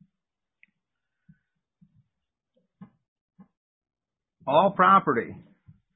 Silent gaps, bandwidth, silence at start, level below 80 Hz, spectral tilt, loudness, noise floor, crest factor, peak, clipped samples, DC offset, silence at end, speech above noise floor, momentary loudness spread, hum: 3.08-3.28 s, 3.57-3.81 s; 4 kHz; 2.8 s; -70 dBFS; -10 dB/octave; -21 LUFS; -88 dBFS; 24 dB; -6 dBFS; under 0.1%; under 0.1%; 0.6 s; 66 dB; 19 LU; none